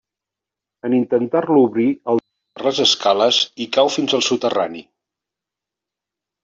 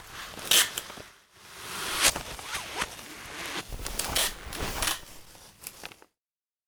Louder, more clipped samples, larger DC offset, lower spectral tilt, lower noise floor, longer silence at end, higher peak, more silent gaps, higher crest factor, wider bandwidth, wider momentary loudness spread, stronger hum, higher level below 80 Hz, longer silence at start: first, -17 LUFS vs -28 LUFS; neither; neither; first, -3.5 dB/octave vs -0.5 dB/octave; second, -86 dBFS vs under -90 dBFS; first, 1.6 s vs 0.8 s; first, -2 dBFS vs -8 dBFS; neither; second, 16 dB vs 26 dB; second, 7.8 kHz vs over 20 kHz; second, 8 LU vs 22 LU; neither; second, -66 dBFS vs -48 dBFS; first, 0.85 s vs 0 s